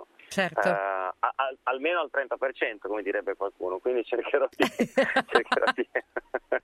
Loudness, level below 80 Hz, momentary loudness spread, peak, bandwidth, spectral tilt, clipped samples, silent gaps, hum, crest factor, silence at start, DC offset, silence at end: -28 LUFS; -68 dBFS; 8 LU; -4 dBFS; 14.5 kHz; -4.5 dB/octave; under 0.1%; none; none; 24 dB; 0 s; under 0.1%; 0.05 s